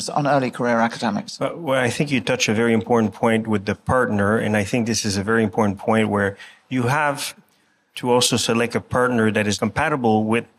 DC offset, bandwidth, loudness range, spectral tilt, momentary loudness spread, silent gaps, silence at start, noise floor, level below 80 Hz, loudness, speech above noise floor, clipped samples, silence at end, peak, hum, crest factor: under 0.1%; 15.5 kHz; 2 LU; -4.5 dB/octave; 7 LU; none; 0 s; -62 dBFS; -54 dBFS; -20 LUFS; 42 dB; under 0.1%; 0.15 s; -6 dBFS; none; 14 dB